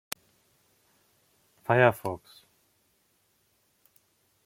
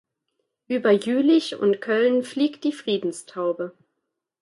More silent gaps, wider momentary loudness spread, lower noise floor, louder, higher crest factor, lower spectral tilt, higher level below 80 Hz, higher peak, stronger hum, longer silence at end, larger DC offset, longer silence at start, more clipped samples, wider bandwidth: neither; first, 19 LU vs 10 LU; second, -71 dBFS vs -80 dBFS; second, -27 LUFS vs -23 LUFS; first, 28 dB vs 16 dB; about the same, -6 dB/octave vs -5 dB/octave; first, -70 dBFS vs -76 dBFS; about the same, -4 dBFS vs -6 dBFS; neither; first, 2.3 s vs 0.7 s; neither; first, 1.7 s vs 0.7 s; neither; first, 16.5 kHz vs 11.5 kHz